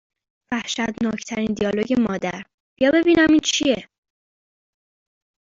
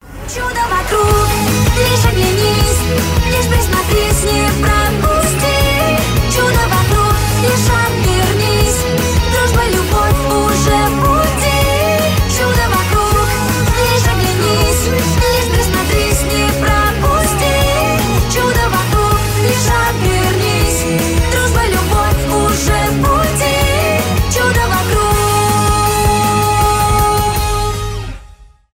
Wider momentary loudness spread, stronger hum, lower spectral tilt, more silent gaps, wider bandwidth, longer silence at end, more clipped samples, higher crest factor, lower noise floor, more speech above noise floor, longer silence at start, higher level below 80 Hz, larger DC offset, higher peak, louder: first, 12 LU vs 2 LU; neither; about the same, -4 dB/octave vs -4.5 dB/octave; first, 2.54-2.76 s vs none; second, 7.6 kHz vs 16.5 kHz; first, 1.7 s vs 0.3 s; neither; first, 18 dB vs 12 dB; first, under -90 dBFS vs -39 dBFS; first, over 70 dB vs 27 dB; first, 0.5 s vs 0.05 s; second, -54 dBFS vs -20 dBFS; neither; second, -6 dBFS vs 0 dBFS; second, -20 LUFS vs -13 LUFS